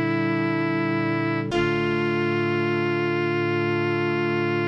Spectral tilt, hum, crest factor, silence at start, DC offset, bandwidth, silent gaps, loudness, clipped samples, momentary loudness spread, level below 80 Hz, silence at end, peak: -7.5 dB/octave; none; 12 dB; 0 s; under 0.1%; 7.6 kHz; none; -23 LUFS; under 0.1%; 1 LU; -56 dBFS; 0 s; -12 dBFS